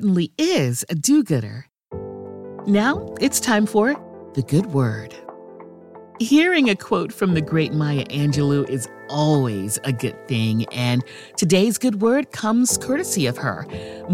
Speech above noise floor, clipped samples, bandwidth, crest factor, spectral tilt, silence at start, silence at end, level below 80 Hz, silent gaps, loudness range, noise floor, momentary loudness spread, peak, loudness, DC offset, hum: 22 dB; under 0.1%; 16.5 kHz; 16 dB; -5 dB/octave; 0 s; 0 s; -54 dBFS; none; 2 LU; -42 dBFS; 15 LU; -4 dBFS; -20 LUFS; under 0.1%; none